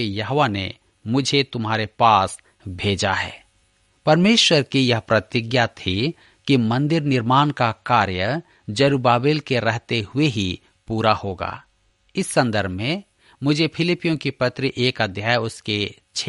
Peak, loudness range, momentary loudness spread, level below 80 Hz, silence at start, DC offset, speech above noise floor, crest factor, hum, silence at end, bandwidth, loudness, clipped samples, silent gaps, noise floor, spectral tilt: -2 dBFS; 4 LU; 11 LU; -54 dBFS; 0 s; under 0.1%; 42 dB; 18 dB; none; 0 s; 11.5 kHz; -20 LUFS; under 0.1%; none; -62 dBFS; -5 dB/octave